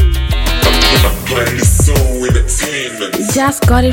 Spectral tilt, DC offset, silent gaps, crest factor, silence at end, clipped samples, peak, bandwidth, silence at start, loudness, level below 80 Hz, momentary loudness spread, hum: -4 dB/octave; under 0.1%; none; 12 dB; 0 s; under 0.1%; 0 dBFS; 17 kHz; 0 s; -12 LUFS; -16 dBFS; 7 LU; none